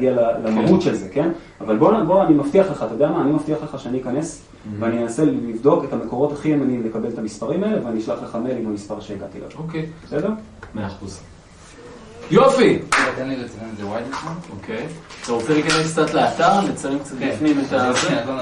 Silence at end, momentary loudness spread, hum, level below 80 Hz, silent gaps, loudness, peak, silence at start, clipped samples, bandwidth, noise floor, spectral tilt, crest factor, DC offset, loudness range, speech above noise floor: 0 s; 16 LU; none; -50 dBFS; none; -20 LUFS; -2 dBFS; 0 s; under 0.1%; 11 kHz; -43 dBFS; -5.5 dB/octave; 18 dB; under 0.1%; 8 LU; 23 dB